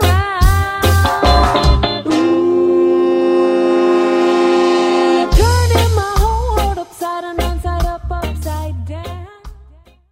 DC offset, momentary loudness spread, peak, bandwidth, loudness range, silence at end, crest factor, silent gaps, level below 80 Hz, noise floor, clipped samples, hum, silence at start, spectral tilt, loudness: under 0.1%; 10 LU; 0 dBFS; 16.5 kHz; 8 LU; 0.6 s; 14 dB; none; -20 dBFS; -44 dBFS; under 0.1%; none; 0 s; -6 dB/octave; -14 LUFS